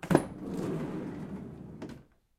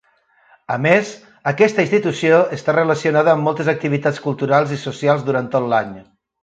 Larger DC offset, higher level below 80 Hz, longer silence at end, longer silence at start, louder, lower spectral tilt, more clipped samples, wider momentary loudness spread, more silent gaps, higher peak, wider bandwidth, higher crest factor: neither; first, -56 dBFS vs -62 dBFS; about the same, 0.35 s vs 0.4 s; second, 0 s vs 0.7 s; second, -36 LUFS vs -17 LUFS; about the same, -7 dB/octave vs -6.5 dB/octave; neither; first, 17 LU vs 8 LU; neither; second, -6 dBFS vs 0 dBFS; first, 15.5 kHz vs 9 kHz; first, 28 dB vs 18 dB